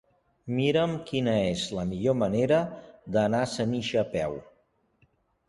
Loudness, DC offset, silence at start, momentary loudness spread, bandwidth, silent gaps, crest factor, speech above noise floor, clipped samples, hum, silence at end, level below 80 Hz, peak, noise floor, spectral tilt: -27 LUFS; under 0.1%; 0.45 s; 9 LU; 11.5 kHz; none; 16 dB; 41 dB; under 0.1%; none; 1.05 s; -56 dBFS; -12 dBFS; -68 dBFS; -6 dB/octave